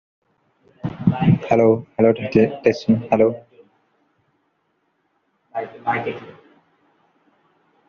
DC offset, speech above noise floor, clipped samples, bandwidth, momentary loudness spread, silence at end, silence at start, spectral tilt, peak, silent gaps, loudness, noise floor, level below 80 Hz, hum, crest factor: under 0.1%; 51 dB; under 0.1%; 7 kHz; 16 LU; 1.6 s; 0.85 s; -7.5 dB/octave; 0 dBFS; none; -19 LUFS; -68 dBFS; -54 dBFS; none; 20 dB